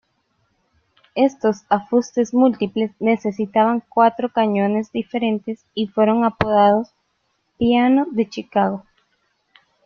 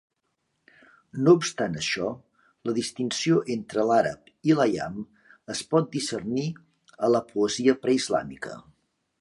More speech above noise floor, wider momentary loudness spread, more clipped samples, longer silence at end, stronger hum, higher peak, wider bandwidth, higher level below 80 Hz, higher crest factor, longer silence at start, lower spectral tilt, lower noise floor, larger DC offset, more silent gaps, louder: about the same, 51 dB vs 52 dB; second, 8 LU vs 16 LU; neither; first, 1.05 s vs 0.6 s; neither; first, -2 dBFS vs -6 dBFS; second, 7 kHz vs 11.5 kHz; first, -56 dBFS vs -64 dBFS; about the same, 18 dB vs 20 dB; about the same, 1.15 s vs 1.15 s; first, -6.5 dB/octave vs -5 dB/octave; second, -69 dBFS vs -77 dBFS; neither; neither; first, -19 LUFS vs -25 LUFS